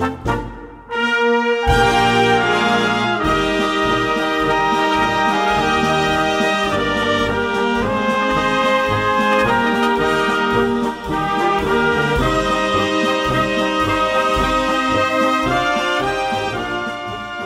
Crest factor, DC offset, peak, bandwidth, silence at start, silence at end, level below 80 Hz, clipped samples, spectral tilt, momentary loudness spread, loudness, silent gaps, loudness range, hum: 14 dB; under 0.1%; -2 dBFS; 16 kHz; 0 s; 0 s; -34 dBFS; under 0.1%; -4.5 dB/octave; 6 LU; -17 LUFS; none; 1 LU; none